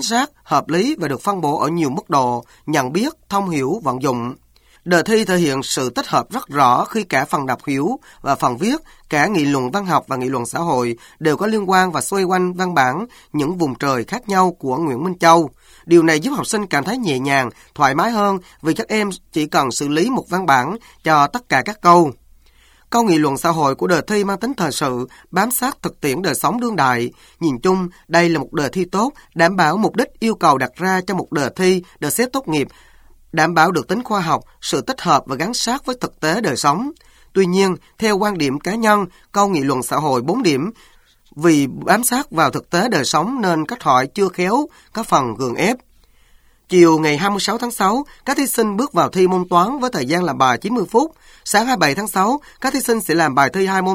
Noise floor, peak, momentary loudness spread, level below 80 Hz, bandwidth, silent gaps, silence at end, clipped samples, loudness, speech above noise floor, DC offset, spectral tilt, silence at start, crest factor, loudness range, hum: -51 dBFS; 0 dBFS; 7 LU; -52 dBFS; 19 kHz; none; 0 s; under 0.1%; -17 LUFS; 34 dB; under 0.1%; -4.5 dB/octave; 0 s; 18 dB; 3 LU; none